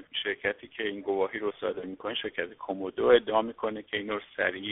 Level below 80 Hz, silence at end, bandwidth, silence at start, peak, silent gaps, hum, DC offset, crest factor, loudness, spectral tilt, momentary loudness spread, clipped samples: -64 dBFS; 0 s; 4 kHz; 0 s; -10 dBFS; none; none; under 0.1%; 20 dB; -30 LUFS; -1.5 dB/octave; 12 LU; under 0.1%